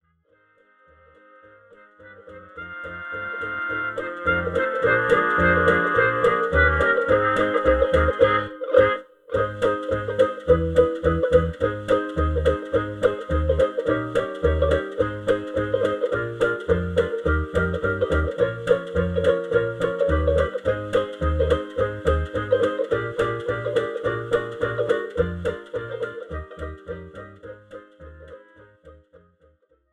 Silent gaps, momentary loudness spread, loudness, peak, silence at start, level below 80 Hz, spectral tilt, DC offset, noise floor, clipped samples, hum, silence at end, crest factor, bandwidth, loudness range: none; 13 LU; -22 LUFS; -4 dBFS; 2 s; -34 dBFS; -7 dB/octave; under 0.1%; -63 dBFS; under 0.1%; none; 1 s; 18 dB; 10 kHz; 13 LU